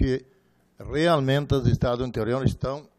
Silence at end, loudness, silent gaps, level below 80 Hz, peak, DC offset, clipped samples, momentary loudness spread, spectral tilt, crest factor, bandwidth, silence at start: 0.15 s; -24 LUFS; none; -38 dBFS; -6 dBFS; under 0.1%; under 0.1%; 9 LU; -7 dB/octave; 18 dB; 13 kHz; 0 s